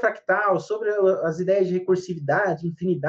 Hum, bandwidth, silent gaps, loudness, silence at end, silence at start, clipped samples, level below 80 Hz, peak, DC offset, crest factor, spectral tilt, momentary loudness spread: none; 7.6 kHz; none; -23 LUFS; 0 s; 0 s; under 0.1%; -66 dBFS; -8 dBFS; under 0.1%; 14 dB; -7.5 dB/octave; 4 LU